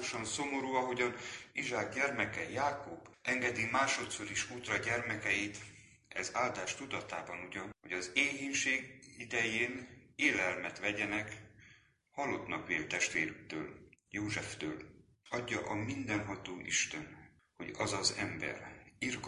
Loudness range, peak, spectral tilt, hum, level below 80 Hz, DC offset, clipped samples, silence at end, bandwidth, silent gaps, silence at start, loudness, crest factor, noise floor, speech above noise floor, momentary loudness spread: 4 LU; -14 dBFS; -3 dB/octave; none; -66 dBFS; under 0.1%; under 0.1%; 0 s; 11.5 kHz; none; 0 s; -36 LUFS; 24 dB; -65 dBFS; 28 dB; 13 LU